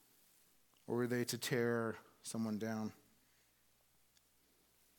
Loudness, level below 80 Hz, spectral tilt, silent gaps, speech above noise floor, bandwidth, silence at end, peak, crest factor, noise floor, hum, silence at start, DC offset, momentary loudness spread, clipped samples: -40 LUFS; -86 dBFS; -5 dB/octave; none; 35 dB; 19 kHz; 2.05 s; -22 dBFS; 20 dB; -74 dBFS; none; 0.9 s; under 0.1%; 10 LU; under 0.1%